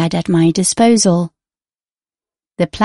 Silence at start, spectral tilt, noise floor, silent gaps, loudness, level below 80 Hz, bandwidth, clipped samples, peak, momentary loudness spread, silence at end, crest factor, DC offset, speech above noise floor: 0 s; -5 dB/octave; under -90 dBFS; none; -13 LUFS; -48 dBFS; 11.5 kHz; under 0.1%; 0 dBFS; 10 LU; 0 s; 14 dB; under 0.1%; over 77 dB